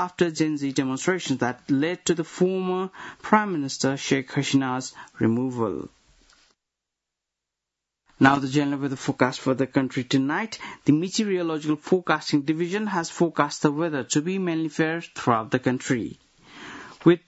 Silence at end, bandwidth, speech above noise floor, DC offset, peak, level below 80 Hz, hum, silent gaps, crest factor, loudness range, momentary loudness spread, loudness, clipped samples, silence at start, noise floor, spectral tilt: 0.1 s; 8.2 kHz; 61 dB; under 0.1%; -2 dBFS; -64 dBFS; none; none; 24 dB; 3 LU; 6 LU; -24 LUFS; under 0.1%; 0 s; -85 dBFS; -5 dB/octave